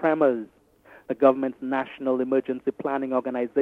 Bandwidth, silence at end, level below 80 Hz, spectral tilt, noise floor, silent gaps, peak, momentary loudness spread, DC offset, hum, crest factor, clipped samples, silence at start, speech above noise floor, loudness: 4.1 kHz; 0 s; -70 dBFS; -8.5 dB/octave; -53 dBFS; none; -6 dBFS; 9 LU; under 0.1%; none; 20 dB; under 0.1%; 0 s; 30 dB; -25 LUFS